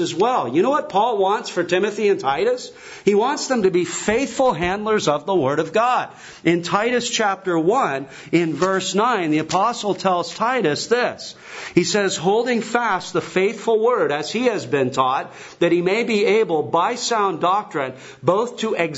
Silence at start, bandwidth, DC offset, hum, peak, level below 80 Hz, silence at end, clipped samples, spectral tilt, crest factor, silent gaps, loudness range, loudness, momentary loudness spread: 0 s; 8 kHz; under 0.1%; none; -2 dBFS; -56 dBFS; 0 s; under 0.1%; -4.5 dB/octave; 18 dB; none; 1 LU; -20 LUFS; 5 LU